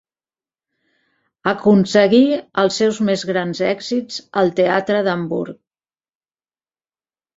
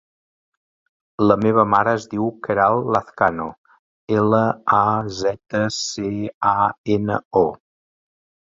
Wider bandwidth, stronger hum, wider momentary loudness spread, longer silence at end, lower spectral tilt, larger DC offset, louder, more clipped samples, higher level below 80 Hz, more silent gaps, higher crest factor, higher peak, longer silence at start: about the same, 7.8 kHz vs 7.8 kHz; neither; first, 11 LU vs 8 LU; first, 1.85 s vs 0.9 s; about the same, -5.5 dB/octave vs -5.5 dB/octave; neither; about the same, -17 LUFS vs -19 LUFS; neither; second, -60 dBFS vs -52 dBFS; second, none vs 3.58-3.64 s, 3.79-4.07 s, 6.34-6.41 s, 6.78-6.84 s, 7.25-7.31 s; about the same, 18 dB vs 18 dB; about the same, -2 dBFS vs -2 dBFS; first, 1.45 s vs 1.2 s